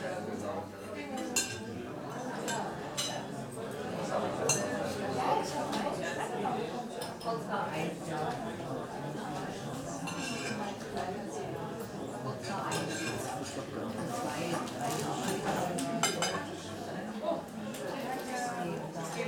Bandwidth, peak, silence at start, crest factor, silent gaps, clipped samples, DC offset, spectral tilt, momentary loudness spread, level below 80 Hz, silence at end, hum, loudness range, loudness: 19.5 kHz; -14 dBFS; 0 s; 22 dB; none; under 0.1%; under 0.1%; -4 dB/octave; 8 LU; -66 dBFS; 0 s; none; 4 LU; -36 LUFS